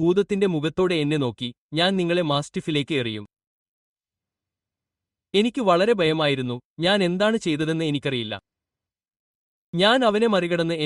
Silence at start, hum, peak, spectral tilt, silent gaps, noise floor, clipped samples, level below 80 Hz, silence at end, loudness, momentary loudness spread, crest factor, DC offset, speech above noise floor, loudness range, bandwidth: 0 s; none; -4 dBFS; -5.5 dB/octave; 1.58-1.69 s, 3.47-3.96 s, 6.65-6.76 s, 9.19-9.73 s; -89 dBFS; under 0.1%; -60 dBFS; 0 s; -22 LUFS; 9 LU; 18 dB; under 0.1%; 68 dB; 6 LU; 11.5 kHz